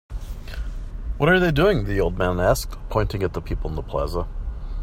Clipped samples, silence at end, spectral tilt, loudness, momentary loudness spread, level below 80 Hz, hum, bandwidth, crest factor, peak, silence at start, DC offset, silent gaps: under 0.1%; 0 s; -6 dB/octave; -22 LUFS; 17 LU; -30 dBFS; none; 16.5 kHz; 18 dB; -6 dBFS; 0.1 s; under 0.1%; none